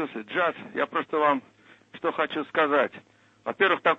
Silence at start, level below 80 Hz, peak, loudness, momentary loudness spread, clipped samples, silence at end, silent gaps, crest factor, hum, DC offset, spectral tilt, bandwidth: 0 s; -76 dBFS; -8 dBFS; -26 LUFS; 8 LU; under 0.1%; 0 s; none; 18 dB; none; under 0.1%; -6 dB/octave; 7.8 kHz